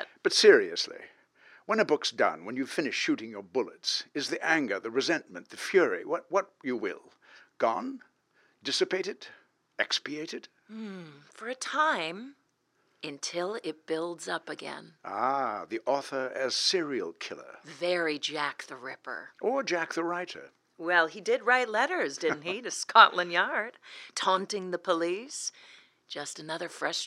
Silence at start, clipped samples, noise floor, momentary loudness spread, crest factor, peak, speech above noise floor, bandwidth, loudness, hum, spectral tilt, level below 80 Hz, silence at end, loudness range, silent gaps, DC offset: 0 s; under 0.1%; -73 dBFS; 17 LU; 28 dB; -4 dBFS; 43 dB; 13.5 kHz; -29 LUFS; none; -2.5 dB/octave; under -90 dBFS; 0 s; 8 LU; none; under 0.1%